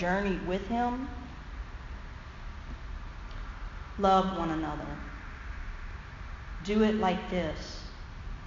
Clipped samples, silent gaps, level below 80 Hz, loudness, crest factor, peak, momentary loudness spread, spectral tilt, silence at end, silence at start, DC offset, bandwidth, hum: under 0.1%; none; -42 dBFS; -31 LUFS; 20 dB; -12 dBFS; 18 LU; -5 dB/octave; 0 s; 0 s; under 0.1%; 7.6 kHz; none